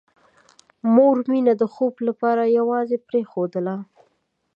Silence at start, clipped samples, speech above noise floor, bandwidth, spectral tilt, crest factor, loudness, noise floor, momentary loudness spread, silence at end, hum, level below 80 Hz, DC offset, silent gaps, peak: 0.85 s; under 0.1%; 48 dB; 5.6 kHz; -9 dB/octave; 18 dB; -20 LUFS; -68 dBFS; 11 LU; 0.7 s; none; -78 dBFS; under 0.1%; none; -4 dBFS